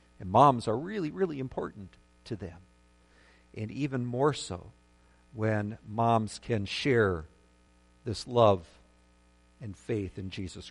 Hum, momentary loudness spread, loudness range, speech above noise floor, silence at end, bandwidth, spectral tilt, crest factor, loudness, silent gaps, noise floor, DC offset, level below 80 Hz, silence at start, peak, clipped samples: 60 Hz at -60 dBFS; 19 LU; 7 LU; 33 dB; 0 s; 11.5 kHz; -6.5 dB/octave; 24 dB; -30 LUFS; none; -62 dBFS; under 0.1%; -58 dBFS; 0.2 s; -6 dBFS; under 0.1%